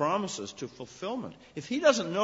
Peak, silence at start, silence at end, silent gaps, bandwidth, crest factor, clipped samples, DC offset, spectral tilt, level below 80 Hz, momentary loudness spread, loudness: -10 dBFS; 0 s; 0 s; none; 8 kHz; 20 dB; under 0.1%; under 0.1%; -4 dB/octave; -70 dBFS; 17 LU; -30 LUFS